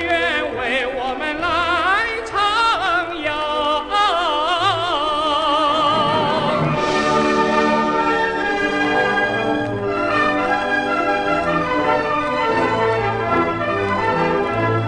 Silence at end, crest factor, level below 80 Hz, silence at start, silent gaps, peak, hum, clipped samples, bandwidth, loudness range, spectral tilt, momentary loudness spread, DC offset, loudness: 0 s; 14 dB; -44 dBFS; 0 s; none; -4 dBFS; none; under 0.1%; 10.5 kHz; 1 LU; -5 dB/octave; 4 LU; under 0.1%; -18 LUFS